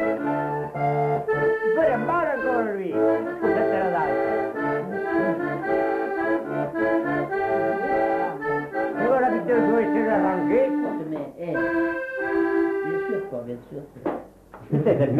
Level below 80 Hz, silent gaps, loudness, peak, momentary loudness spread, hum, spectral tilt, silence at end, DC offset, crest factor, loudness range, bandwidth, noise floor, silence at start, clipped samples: -56 dBFS; none; -24 LUFS; -8 dBFS; 7 LU; none; -9 dB/octave; 0 s; under 0.1%; 14 dB; 4 LU; 13 kHz; -44 dBFS; 0 s; under 0.1%